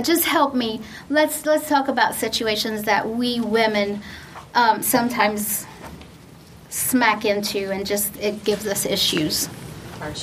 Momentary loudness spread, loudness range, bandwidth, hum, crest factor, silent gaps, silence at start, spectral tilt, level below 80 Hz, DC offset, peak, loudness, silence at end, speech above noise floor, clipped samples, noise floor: 14 LU; 2 LU; 15.5 kHz; none; 20 dB; none; 0 s; -3 dB/octave; -52 dBFS; under 0.1%; -2 dBFS; -21 LUFS; 0 s; 23 dB; under 0.1%; -44 dBFS